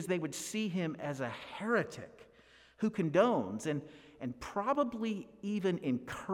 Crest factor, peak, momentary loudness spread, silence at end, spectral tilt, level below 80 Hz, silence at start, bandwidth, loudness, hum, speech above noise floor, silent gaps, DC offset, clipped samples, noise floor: 20 dB; -16 dBFS; 13 LU; 0 s; -5.5 dB/octave; -68 dBFS; 0 s; 16.5 kHz; -35 LUFS; none; 28 dB; none; under 0.1%; under 0.1%; -62 dBFS